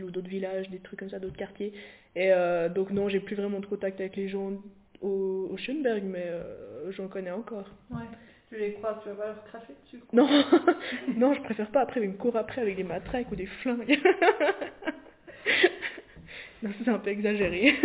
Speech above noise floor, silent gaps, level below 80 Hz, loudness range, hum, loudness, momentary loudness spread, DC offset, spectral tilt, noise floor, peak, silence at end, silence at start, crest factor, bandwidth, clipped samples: 21 dB; none; -60 dBFS; 9 LU; none; -28 LUFS; 18 LU; under 0.1%; -3.5 dB/octave; -50 dBFS; -8 dBFS; 0 s; 0 s; 22 dB; 4 kHz; under 0.1%